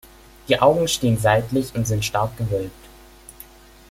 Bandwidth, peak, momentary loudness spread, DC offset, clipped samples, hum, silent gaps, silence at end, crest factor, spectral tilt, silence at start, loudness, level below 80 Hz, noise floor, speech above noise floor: 16.5 kHz; 0 dBFS; 13 LU; under 0.1%; under 0.1%; none; none; 1.05 s; 20 dB; -5 dB/octave; 0.45 s; -20 LUFS; -44 dBFS; -45 dBFS; 26 dB